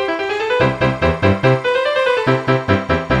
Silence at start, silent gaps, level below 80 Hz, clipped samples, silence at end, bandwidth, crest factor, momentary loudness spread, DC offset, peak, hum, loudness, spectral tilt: 0 s; none; -36 dBFS; under 0.1%; 0 s; 9.6 kHz; 16 dB; 3 LU; under 0.1%; 0 dBFS; none; -16 LUFS; -7 dB/octave